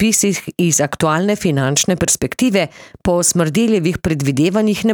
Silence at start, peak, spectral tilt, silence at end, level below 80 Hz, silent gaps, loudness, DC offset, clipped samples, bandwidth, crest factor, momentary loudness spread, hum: 0 s; -2 dBFS; -4 dB/octave; 0 s; -42 dBFS; none; -16 LUFS; under 0.1%; under 0.1%; over 20 kHz; 12 dB; 4 LU; none